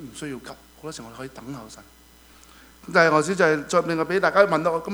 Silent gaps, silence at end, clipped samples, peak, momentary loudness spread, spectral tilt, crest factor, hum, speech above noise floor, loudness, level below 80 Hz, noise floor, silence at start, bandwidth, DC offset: none; 0 s; under 0.1%; -2 dBFS; 20 LU; -5 dB/octave; 22 dB; none; 29 dB; -20 LUFS; -56 dBFS; -51 dBFS; 0 s; over 20 kHz; under 0.1%